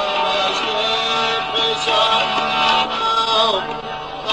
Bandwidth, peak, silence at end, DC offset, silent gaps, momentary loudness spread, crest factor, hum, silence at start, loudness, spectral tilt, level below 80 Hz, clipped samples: 11.5 kHz; -4 dBFS; 0 s; under 0.1%; none; 7 LU; 14 dB; none; 0 s; -17 LUFS; -2 dB/octave; -48 dBFS; under 0.1%